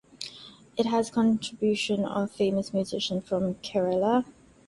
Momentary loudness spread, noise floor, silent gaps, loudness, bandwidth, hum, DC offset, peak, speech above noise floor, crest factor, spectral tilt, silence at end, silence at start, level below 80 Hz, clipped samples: 14 LU; -48 dBFS; none; -27 LUFS; 11.5 kHz; none; under 0.1%; -10 dBFS; 21 dB; 18 dB; -5.5 dB/octave; 0.35 s; 0.2 s; -62 dBFS; under 0.1%